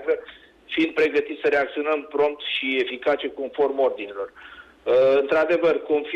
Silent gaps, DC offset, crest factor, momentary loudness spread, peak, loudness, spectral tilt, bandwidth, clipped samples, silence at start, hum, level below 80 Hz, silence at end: none; under 0.1%; 12 dB; 10 LU; -12 dBFS; -22 LUFS; -5 dB/octave; 7.6 kHz; under 0.1%; 0 s; none; -62 dBFS; 0 s